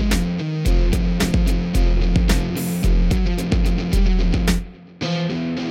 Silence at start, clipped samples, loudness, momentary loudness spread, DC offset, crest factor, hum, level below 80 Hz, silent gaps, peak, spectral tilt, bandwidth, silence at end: 0 s; under 0.1%; -21 LUFS; 4 LU; under 0.1%; 12 dB; none; -20 dBFS; none; -4 dBFS; -6 dB/octave; 16.5 kHz; 0 s